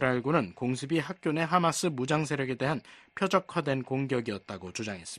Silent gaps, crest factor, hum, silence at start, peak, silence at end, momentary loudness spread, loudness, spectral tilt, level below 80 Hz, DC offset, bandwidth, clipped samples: none; 22 dB; none; 0 s; -8 dBFS; 0 s; 10 LU; -30 LUFS; -5.5 dB/octave; -66 dBFS; under 0.1%; 12.5 kHz; under 0.1%